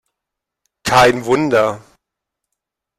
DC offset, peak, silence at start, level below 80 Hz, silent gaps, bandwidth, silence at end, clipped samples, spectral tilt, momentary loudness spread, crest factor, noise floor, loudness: under 0.1%; -2 dBFS; 0.85 s; -48 dBFS; none; 15.5 kHz; 1.2 s; under 0.1%; -4.5 dB/octave; 13 LU; 16 dB; -82 dBFS; -14 LUFS